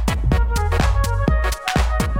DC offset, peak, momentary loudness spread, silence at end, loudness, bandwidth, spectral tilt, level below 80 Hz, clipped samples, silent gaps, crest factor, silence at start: under 0.1%; -2 dBFS; 2 LU; 0 s; -20 LUFS; 16.5 kHz; -5.5 dB/octave; -20 dBFS; under 0.1%; none; 16 dB; 0 s